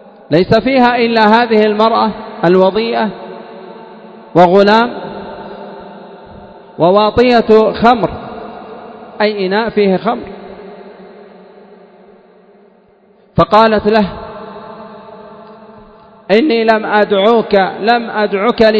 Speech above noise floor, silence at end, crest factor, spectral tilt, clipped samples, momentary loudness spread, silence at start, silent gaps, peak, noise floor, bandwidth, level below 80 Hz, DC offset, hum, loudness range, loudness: 38 dB; 0 s; 14 dB; -7.5 dB/octave; 0.5%; 23 LU; 0.3 s; none; 0 dBFS; -48 dBFS; 8 kHz; -42 dBFS; under 0.1%; none; 6 LU; -11 LUFS